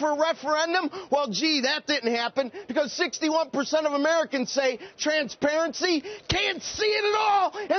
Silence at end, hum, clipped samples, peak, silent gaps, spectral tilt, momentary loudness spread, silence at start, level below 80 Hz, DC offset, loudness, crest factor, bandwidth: 0 s; none; under 0.1%; -10 dBFS; none; -1 dB/octave; 5 LU; 0 s; -56 dBFS; under 0.1%; -25 LUFS; 16 dB; 6.8 kHz